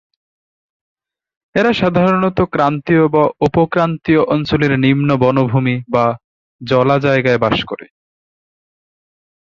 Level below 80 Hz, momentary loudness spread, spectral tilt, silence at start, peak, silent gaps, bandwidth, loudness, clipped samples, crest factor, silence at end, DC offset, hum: -44 dBFS; 5 LU; -8 dB/octave; 1.55 s; 0 dBFS; 6.24-6.59 s; 7.4 kHz; -14 LUFS; under 0.1%; 14 dB; 1.7 s; under 0.1%; none